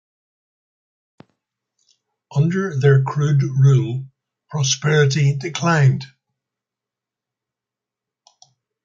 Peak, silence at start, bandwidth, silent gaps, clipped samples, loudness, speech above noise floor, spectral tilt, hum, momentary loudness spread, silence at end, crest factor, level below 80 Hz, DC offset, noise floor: -4 dBFS; 2.3 s; 7.6 kHz; none; under 0.1%; -18 LUFS; 70 dB; -5.5 dB/octave; none; 11 LU; 2.8 s; 18 dB; -60 dBFS; under 0.1%; -87 dBFS